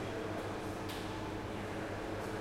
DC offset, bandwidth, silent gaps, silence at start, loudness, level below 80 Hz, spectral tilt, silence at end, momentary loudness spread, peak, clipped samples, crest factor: under 0.1%; 16.5 kHz; none; 0 s; -41 LUFS; -56 dBFS; -5.5 dB/octave; 0 s; 1 LU; -28 dBFS; under 0.1%; 12 dB